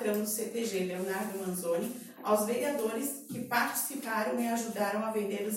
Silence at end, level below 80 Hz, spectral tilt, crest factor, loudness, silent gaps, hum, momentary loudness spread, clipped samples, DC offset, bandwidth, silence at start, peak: 0 s; -80 dBFS; -4 dB/octave; 18 dB; -33 LUFS; none; none; 6 LU; under 0.1%; under 0.1%; 16.5 kHz; 0 s; -14 dBFS